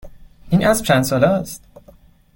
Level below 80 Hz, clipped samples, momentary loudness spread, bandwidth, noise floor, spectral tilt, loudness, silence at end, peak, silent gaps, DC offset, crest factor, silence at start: -44 dBFS; under 0.1%; 14 LU; 17 kHz; -48 dBFS; -5.5 dB/octave; -17 LUFS; 0.8 s; -2 dBFS; none; under 0.1%; 18 dB; 0.05 s